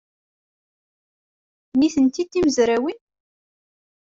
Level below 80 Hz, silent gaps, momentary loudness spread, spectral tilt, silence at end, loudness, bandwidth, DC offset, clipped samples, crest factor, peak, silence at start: -56 dBFS; none; 7 LU; -4 dB/octave; 1.1 s; -20 LUFS; 7.8 kHz; under 0.1%; under 0.1%; 18 dB; -6 dBFS; 1.75 s